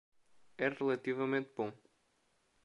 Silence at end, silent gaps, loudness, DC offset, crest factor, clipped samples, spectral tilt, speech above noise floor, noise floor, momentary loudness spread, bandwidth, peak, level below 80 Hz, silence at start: 0.9 s; none; -37 LUFS; under 0.1%; 20 dB; under 0.1%; -7 dB/octave; 40 dB; -76 dBFS; 7 LU; 9.8 kHz; -20 dBFS; -86 dBFS; 0.6 s